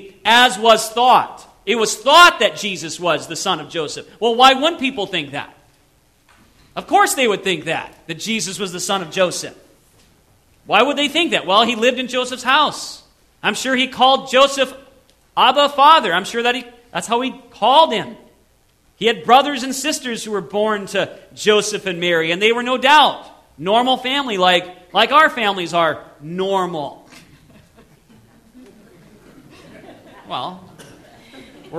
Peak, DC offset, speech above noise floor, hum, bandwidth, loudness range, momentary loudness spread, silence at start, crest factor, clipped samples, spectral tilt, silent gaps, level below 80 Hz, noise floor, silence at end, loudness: 0 dBFS; under 0.1%; 40 dB; none; 16 kHz; 9 LU; 16 LU; 0 s; 18 dB; under 0.1%; -2.5 dB/octave; none; -58 dBFS; -57 dBFS; 0 s; -16 LUFS